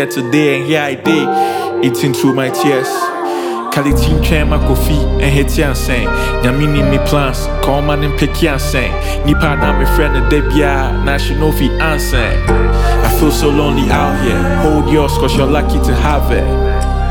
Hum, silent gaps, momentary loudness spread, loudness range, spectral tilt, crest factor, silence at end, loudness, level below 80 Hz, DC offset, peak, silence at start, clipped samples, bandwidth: none; none; 3 LU; 2 LU; -6 dB/octave; 12 dB; 0 s; -13 LUFS; -16 dBFS; under 0.1%; 0 dBFS; 0 s; under 0.1%; 18.5 kHz